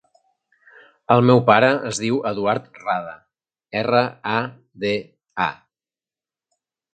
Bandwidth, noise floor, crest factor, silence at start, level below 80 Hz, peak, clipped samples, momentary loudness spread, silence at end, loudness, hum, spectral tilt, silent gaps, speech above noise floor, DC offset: 9.4 kHz; under -90 dBFS; 22 dB; 1.1 s; -62 dBFS; 0 dBFS; under 0.1%; 13 LU; 1.4 s; -20 LUFS; none; -5.5 dB/octave; none; over 71 dB; under 0.1%